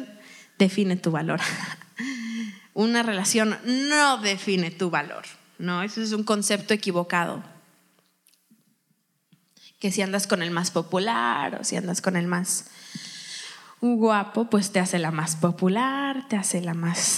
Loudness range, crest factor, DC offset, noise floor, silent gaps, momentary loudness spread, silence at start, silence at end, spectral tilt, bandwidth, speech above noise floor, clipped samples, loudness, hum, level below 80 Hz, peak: 6 LU; 22 dB; under 0.1%; -71 dBFS; none; 13 LU; 0 s; 0 s; -4 dB/octave; 15.5 kHz; 46 dB; under 0.1%; -25 LUFS; none; -86 dBFS; -4 dBFS